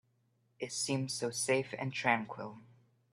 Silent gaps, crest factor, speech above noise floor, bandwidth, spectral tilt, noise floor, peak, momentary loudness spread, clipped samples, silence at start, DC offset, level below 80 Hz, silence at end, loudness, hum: none; 24 dB; 39 dB; 14.5 kHz; -3.5 dB/octave; -75 dBFS; -14 dBFS; 13 LU; under 0.1%; 0.6 s; under 0.1%; -78 dBFS; 0.45 s; -34 LUFS; none